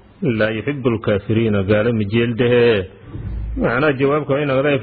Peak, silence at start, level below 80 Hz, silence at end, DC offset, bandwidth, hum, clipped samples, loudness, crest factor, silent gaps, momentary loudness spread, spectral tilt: -2 dBFS; 0.2 s; -36 dBFS; 0 s; under 0.1%; 4.7 kHz; none; under 0.1%; -17 LUFS; 14 dB; none; 10 LU; -11 dB/octave